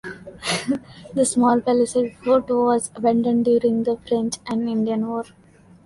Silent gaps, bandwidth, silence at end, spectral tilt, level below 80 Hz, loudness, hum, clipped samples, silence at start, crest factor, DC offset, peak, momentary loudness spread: none; 11.5 kHz; 0.6 s; -4.5 dB/octave; -58 dBFS; -21 LUFS; none; under 0.1%; 0.05 s; 14 dB; under 0.1%; -6 dBFS; 10 LU